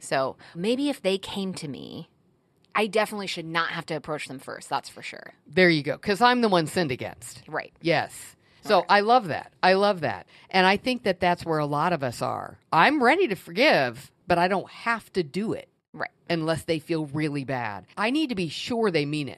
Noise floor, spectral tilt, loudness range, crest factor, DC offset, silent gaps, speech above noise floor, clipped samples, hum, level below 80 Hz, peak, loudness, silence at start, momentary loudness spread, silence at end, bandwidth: -65 dBFS; -5 dB/octave; 6 LU; 22 dB; under 0.1%; 15.88-15.93 s; 40 dB; under 0.1%; none; -62 dBFS; -4 dBFS; -25 LUFS; 0 s; 16 LU; 0 s; 14.5 kHz